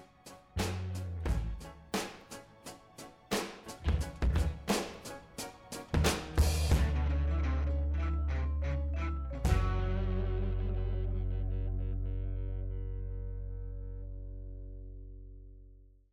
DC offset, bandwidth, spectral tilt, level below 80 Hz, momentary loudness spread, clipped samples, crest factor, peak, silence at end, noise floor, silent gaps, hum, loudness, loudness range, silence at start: under 0.1%; 16 kHz; -5.5 dB/octave; -36 dBFS; 18 LU; under 0.1%; 18 dB; -16 dBFS; 0.25 s; -57 dBFS; none; none; -35 LUFS; 9 LU; 0 s